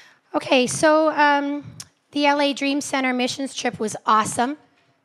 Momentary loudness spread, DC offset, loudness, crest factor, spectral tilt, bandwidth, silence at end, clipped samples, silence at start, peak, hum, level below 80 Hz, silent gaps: 13 LU; under 0.1%; -20 LUFS; 18 dB; -3 dB/octave; 13.5 kHz; 0.5 s; under 0.1%; 0.35 s; -4 dBFS; none; -68 dBFS; none